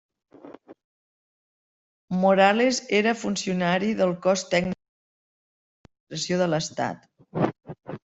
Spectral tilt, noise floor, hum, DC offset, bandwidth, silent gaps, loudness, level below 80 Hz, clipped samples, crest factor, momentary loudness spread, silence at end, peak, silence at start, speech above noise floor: -4.5 dB/octave; -46 dBFS; none; under 0.1%; 8.2 kHz; 0.84-2.08 s, 4.89-5.84 s, 6.00-6.07 s; -24 LUFS; -62 dBFS; under 0.1%; 22 dB; 18 LU; 0.2 s; -4 dBFS; 0.45 s; 24 dB